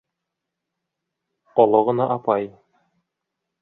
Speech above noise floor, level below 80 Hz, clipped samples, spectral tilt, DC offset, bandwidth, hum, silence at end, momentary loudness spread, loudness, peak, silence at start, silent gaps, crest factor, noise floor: 64 dB; -70 dBFS; under 0.1%; -10.5 dB/octave; under 0.1%; 4.1 kHz; none; 1.15 s; 8 LU; -20 LUFS; -2 dBFS; 1.55 s; none; 22 dB; -82 dBFS